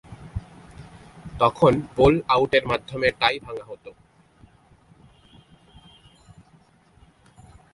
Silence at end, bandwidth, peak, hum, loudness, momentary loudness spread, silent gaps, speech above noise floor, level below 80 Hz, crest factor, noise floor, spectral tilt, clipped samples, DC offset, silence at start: 3.85 s; 11.5 kHz; -2 dBFS; none; -21 LUFS; 25 LU; none; 36 dB; -46 dBFS; 24 dB; -57 dBFS; -6.5 dB/octave; under 0.1%; under 0.1%; 0.1 s